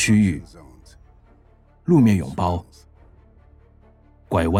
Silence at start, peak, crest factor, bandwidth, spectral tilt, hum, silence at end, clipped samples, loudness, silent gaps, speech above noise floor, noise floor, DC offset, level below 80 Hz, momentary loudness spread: 0 s; -6 dBFS; 18 dB; 14 kHz; -6 dB/octave; none; 0 s; under 0.1%; -20 LUFS; none; 35 dB; -53 dBFS; under 0.1%; -46 dBFS; 15 LU